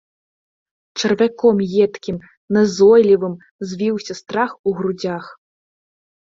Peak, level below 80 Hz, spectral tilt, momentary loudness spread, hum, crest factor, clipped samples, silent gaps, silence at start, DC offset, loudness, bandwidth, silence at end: -2 dBFS; -58 dBFS; -5.5 dB/octave; 17 LU; none; 16 dB; under 0.1%; 2.37-2.48 s, 3.51-3.59 s, 4.59-4.64 s; 0.95 s; under 0.1%; -17 LUFS; 7.6 kHz; 1 s